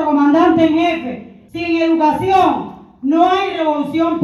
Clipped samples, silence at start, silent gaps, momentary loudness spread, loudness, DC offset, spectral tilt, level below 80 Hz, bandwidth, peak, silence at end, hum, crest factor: under 0.1%; 0 s; none; 14 LU; -15 LUFS; under 0.1%; -6.5 dB/octave; -50 dBFS; 11.5 kHz; 0 dBFS; 0 s; none; 14 dB